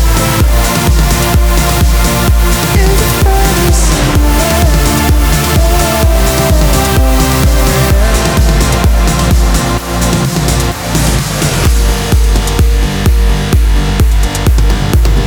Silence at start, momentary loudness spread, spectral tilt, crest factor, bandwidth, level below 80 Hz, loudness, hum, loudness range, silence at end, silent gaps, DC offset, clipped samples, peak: 0 s; 2 LU; -4.5 dB/octave; 8 dB; over 20 kHz; -10 dBFS; -10 LUFS; none; 2 LU; 0 s; none; under 0.1%; under 0.1%; 0 dBFS